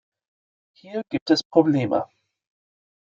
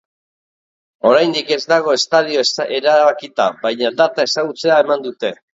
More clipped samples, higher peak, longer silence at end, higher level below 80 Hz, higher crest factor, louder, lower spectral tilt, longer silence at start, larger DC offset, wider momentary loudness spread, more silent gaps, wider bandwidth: neither; about the same, -2 dBFS vs 0 dBFS; first, 1.05 s vs 0.25 s; about the same, -70 dBFS vs -68 dBFS; first, 22 dB vs 16 dB; second, -22 LUFS vs -15 LUFS; first, -6.5 dB/octave vs -3 dB/octave; second, 0.85 s vs 1.05 s; neither; first, 14 LU vs 6 LU; first, 1.21-1.26 s, 1.45-1.50 s vs none; about the same, 7.6 kHz vs 7.8 kHz